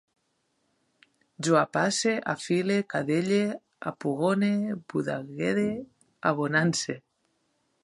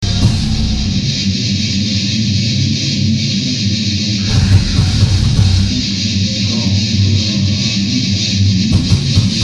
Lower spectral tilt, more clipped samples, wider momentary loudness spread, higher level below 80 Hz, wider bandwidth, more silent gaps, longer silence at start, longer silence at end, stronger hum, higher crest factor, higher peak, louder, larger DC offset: about the same, -5 dB/octave vs -4.5 dB/octave; neither; first, 9 LU vs 3 LU; second, -70 dBFS vs -24 dBFS; about the same, 11.5 kHz vs 10.5 kHz; neither; first, 1.4 s vs 0 s; first, 0.85 s vs 0 s; neither; first, 20 dB vs 12 dB; second, -8 dBFS vs 0 dBFS; second, -27 LUFS vs -13 LUFS; neither